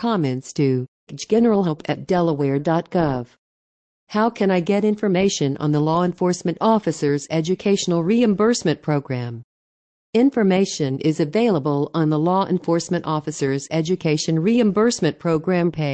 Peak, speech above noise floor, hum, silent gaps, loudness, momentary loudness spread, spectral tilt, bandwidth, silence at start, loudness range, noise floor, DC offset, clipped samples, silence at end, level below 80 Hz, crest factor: -6 dBFS; over 71 dB; none; 0.88-1.07 s, 3.38-4.07 s, 9.44-10.13 s; -20 LUFS; 6 LU; -6 dB/octave; 9 kHz; 0 s; 2 LU; under -90 dBFS; under 0.1%; under 0.1%; 0 s; -56 dBFS; 14 dB